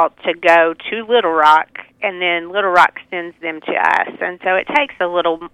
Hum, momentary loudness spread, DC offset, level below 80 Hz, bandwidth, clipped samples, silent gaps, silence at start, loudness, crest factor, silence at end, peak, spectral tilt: none; 12 LU; under 0.1%; -58 dBFS; 12.5 kHz; under 0.1%; none; 0 s; -15 LUFS; 16 dB; 0.05 s; 0 dBFS; -4 dB/octave